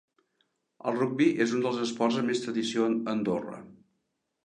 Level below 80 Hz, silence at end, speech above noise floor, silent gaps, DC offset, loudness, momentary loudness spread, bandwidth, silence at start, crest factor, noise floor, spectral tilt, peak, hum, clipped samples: -74 dBFS; 0.7 s; 52 dB; none; under 0.1%; -28 LUFS; 9 LU; 10 kHz; 0.85 s; 18 dB; -80 dBFS; -5 dB/octave; -12 dBFS; none; under 0.1%